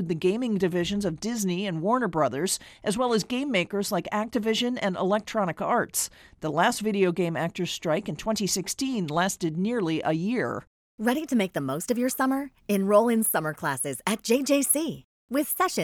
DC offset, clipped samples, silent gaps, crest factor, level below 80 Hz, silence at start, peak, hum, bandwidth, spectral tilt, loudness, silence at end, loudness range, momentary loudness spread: under 0.1%; under 0.1%; 10.67-10.98 s, 15.04-15.28 s; 18 dB; -60 dBFS; 0 s; -8 dBFS; none; 19.5 kHz; -4 dB/octave; -26 LUFS; 0 s; 3 LU; 6 LU